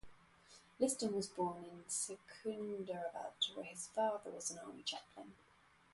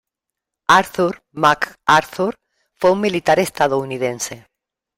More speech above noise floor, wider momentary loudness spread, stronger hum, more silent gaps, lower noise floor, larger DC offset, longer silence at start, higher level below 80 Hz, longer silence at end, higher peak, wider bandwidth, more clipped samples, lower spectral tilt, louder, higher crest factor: second, 23 dB vs 66 dB; first, 18 LU vs 9 LU; neither; neither; second, -66 dBFS vs -83 dBFS; neither; second, 0.05 s vs 0.7 s; second, -78 dBFS vs -56 dBFS; about the same, 0.6 s vs 0.6 s; second, -22 dBFS vs 0 dBFS; second, 12 kHz vs 16 kHz; neither; second, -2.5 dB/octave vs -4 dB/octave; second, -42 LUFS vs -18 LUFS; about the same, 22 dB vs 18 dB